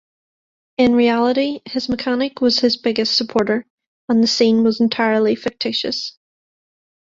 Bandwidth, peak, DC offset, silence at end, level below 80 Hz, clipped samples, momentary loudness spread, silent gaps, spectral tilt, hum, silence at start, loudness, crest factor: 7.6 kHz; -2 dBFS; under 0.1%; 0.95 s; -54 dBFS; under 0.1%; 9 LU; 3.70-3.78 s, 3.87-4.08 s; -4.5 dB/octave; none; 0.8 s; -17 LUFS; 16 dB